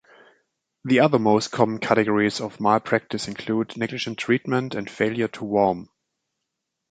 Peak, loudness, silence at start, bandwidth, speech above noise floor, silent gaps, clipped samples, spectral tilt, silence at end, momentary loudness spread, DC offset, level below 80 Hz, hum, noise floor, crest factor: -2 dBFS; -23 LUFS; 0.85 s; 9.4 kHz; 59 dB; none; under 0.1%; -5.5 dB/octave; 1.05 s; 9 LU; under 0.1%; -62 dBFS; none; -81 dBFS; 22 dB